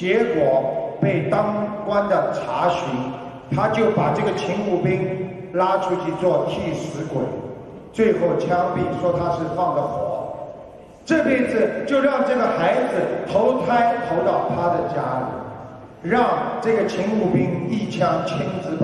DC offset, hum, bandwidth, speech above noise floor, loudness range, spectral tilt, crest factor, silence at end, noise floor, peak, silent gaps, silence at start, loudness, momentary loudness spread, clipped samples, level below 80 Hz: under 0.1%; none; 11.5 kHz; 21 dB; 3 LU; -7 dB/octave; 16 dB; 0 s; -41 dBFS; -4 dBFS; none; 0 s; -21 LUFS; 10 LU; under 0.1%; -52 dBFS